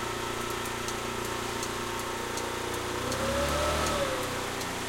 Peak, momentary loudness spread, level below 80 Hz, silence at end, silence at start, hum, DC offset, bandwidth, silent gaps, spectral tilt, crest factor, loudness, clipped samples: -16 dBFS; 5 LU; -46 dBFS; 0 s; 0 s; none; under 0.1%; 17 kHz; none; -3 dB/octave; 16 dB; -31 LUFS; under 0.1%